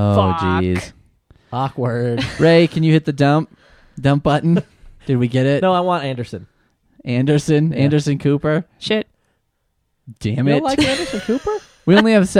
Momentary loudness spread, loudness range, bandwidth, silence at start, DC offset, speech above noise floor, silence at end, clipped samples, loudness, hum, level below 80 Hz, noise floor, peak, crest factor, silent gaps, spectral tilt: 12 LU; 3 LU; 12 kHz; 0 s; under 0.1%; 52 dB; 0 s; under 0.1%; -17 LUFS; none; -46 dBFS; -68 dBFS; 0 dBFS; 18 dB; none; -6.5 dB/octave